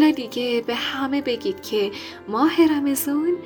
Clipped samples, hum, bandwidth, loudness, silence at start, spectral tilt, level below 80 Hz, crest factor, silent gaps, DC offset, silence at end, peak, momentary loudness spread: under 0.1%; none; over 20 kHz; -22 LUFS; 0 s; -3.5 dB/octave; -64 dBFS; 16 dB; none; under 0.1%; 0 s; -4 dBFS; 8 LU